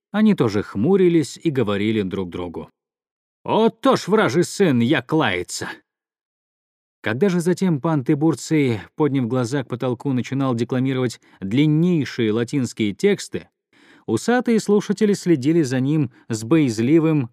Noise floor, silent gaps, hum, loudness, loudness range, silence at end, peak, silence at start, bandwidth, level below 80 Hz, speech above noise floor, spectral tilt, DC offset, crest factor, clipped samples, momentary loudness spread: -53 dBFS; 3.11-3.44 s, 6.25-7.03 s; none; -20 LUFS; 2 LU; 0.05 s; -4 dBFS; 0.15 s; 14.5 kHz; -64 dBFS; 34 dB; -6.5 dB/octave; under 0.1%; 16 dB; under 0.1%; 10 LU